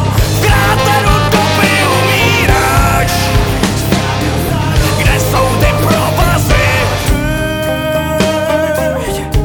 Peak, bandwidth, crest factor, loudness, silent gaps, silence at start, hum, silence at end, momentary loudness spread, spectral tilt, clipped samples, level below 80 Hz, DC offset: 0 dBFS; 19.5 kHz; 10 dB; -11 LUFS; none; 0 s; none; 0 s; 5 LU; -4.5 dB/octave; under 0.1%; -20 dBFS; 0.4%